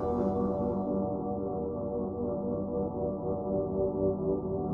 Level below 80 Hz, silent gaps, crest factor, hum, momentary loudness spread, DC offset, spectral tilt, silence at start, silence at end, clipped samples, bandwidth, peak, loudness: -50 dBFS; none; 14 dB; none; 4 LU; under 0.1%; -12.5 dB/octave; 0 s; 0 s; under 0.1%; 2.2 kHz; -16 dBFS; -32 LUFS